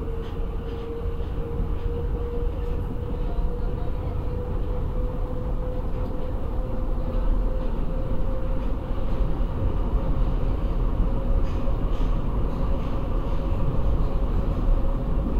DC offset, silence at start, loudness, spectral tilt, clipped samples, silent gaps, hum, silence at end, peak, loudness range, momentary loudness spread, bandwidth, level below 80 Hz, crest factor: 0.3%; 0 s; -29 LUFS; -9.5 dB/octave; under 0.1%; none; none; 0 s; -10 dBFS; 3 LU; 4 LU; 4.5 kHz; -24 dBFS; 14 dB